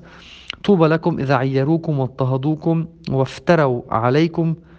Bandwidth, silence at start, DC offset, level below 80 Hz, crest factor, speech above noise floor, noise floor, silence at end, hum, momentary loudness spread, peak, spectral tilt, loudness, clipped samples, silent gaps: 7.8 kHz; 0.05 s; under 0.1%; -50 dBFS; 18 dB; 24 dB; -42 dBFS; 0.2 s; none; 7 LU; 0 dBFS; -8 dB/octave; -18 LUFS; under 0.1%; none